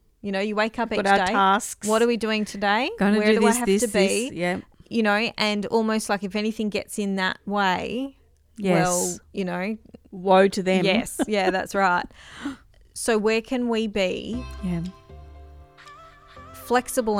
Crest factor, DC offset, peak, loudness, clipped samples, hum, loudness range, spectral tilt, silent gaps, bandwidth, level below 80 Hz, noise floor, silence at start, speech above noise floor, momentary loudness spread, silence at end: 18 dB; under 0.1%; -4 dBFS; -23 LUFS; under 0.1%; none; 6 LU; -4 dB/octave; none; 16.5 kHz; -50 dBFS; -47 dBFS; 0.25 s; 24 dB; 12 LU; 0 s